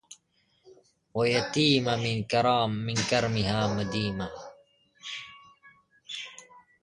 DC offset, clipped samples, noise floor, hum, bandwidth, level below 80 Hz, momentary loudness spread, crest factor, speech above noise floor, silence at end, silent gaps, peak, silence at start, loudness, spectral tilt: under 0.1%; under 0.1%; -69 dBFS; none; 11 kHz; -56 dBFS; 19 LU; 20 dB; 43 dB; 0.25 s; none; -10 dBFS; 0.1 s; -27 LUFS; -5 dB/octave